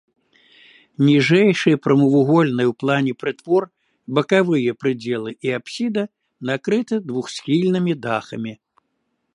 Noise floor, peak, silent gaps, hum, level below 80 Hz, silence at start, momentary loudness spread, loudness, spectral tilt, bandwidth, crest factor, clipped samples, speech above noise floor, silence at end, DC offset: -72 dBFS; -2 dBFS; none; none; -68 dBFS; 1 s; 12 LU; -19 LUFS; -6.5 dB/octave; 11 kHz; 18 dB; under 0.1%; 54 dB; 0.8 s; under 0.1%